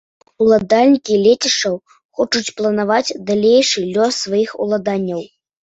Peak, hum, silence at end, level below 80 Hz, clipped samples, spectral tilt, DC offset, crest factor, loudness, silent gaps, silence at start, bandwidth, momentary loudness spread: -2 dBFS; none; 0.4 s; -58 dBFS; under 0.1%; -3.5 dB/octave; under 0.1%; 14 dB; -15 LUFS; 2.05-2.09 s; 0.4 s; 8.2 kHz; 9 LU